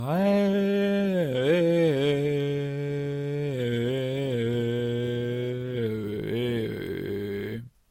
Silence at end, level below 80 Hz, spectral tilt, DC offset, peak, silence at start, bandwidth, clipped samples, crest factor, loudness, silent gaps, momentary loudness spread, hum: 0.2 s; -58 dBFS; -7.5 dB/octave; under 0.1%; -12 dBFS; 0 s; 16.5 kHz; under 0.1%; 14 dB; -27 LUFS; none; 9 LU; none